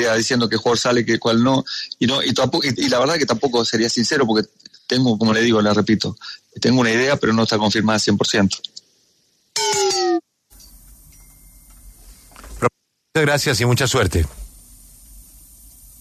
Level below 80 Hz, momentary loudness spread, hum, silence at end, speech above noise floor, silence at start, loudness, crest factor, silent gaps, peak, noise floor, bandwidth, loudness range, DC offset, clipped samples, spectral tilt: -42 dBFS; 7 LU; none; 0.8 s; 44 dB; 0 s; -18 LUFS; 16 dB; none; -2 dBFS; -62 dBFS; 13.5 kHz; 7 LU; under 0.1%; under 0.1%; -4 dB/octave